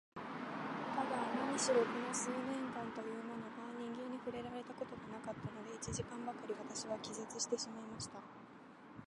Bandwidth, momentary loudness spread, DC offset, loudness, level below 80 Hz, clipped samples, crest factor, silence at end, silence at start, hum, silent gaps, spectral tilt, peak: 11.5 kHz; 11 LU; under 0.1%; -42 LUFS; -70 dBFS; under 0.1%; 20 dB; 0 s; 0.15 s; none; none; -3.5 dB/octave; -22 dBFS